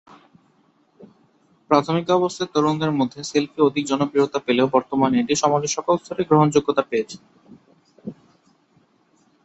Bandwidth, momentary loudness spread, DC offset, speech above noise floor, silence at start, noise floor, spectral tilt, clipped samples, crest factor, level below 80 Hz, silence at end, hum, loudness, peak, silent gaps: 8.2 kHz; 8 LU; under 0.1%; 41 dB; 1 s; -61 dBFS; -5.5 dB/octave; under 0.1%; 20 dB; -62 dBFS; 1.3 s; none; -20 LUFS; -2 dBFS; none